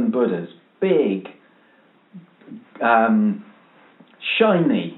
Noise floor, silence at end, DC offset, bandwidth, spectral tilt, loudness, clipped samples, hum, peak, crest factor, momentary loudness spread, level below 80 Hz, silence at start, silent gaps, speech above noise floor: -56 dBFS; 0 s; under 0.1%; 4.1 kHz; -4.5 dB/octave; -19 LUFS; under 0.1%; none; -2 dBFS; 20 dB; 17 LU; -82 dBFS; 0 s; none; 37 dB